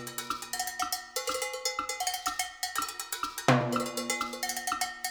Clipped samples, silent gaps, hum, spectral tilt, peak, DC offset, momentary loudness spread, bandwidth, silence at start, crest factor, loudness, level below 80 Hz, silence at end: under 0.1%; none; none; -3 dB/octave; -8 dBFS; under 0.1%; 8 LU; over 20 kHz; 0 s; 24 dB; -31 LUFS; -64 dBFS; 0 s